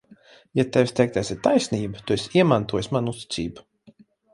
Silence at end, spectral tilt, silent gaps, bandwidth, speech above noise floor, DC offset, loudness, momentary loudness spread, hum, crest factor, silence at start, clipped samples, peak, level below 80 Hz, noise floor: 0.75 s; -6 dB/octave; none; 11.5 kHz; 32 dB; under 0.1%; -23 LUFS; 10 LU; none; 20 dB; 0.55 s; under 0.1%; -2 dBFS; -52 dBFS; -54 dBFS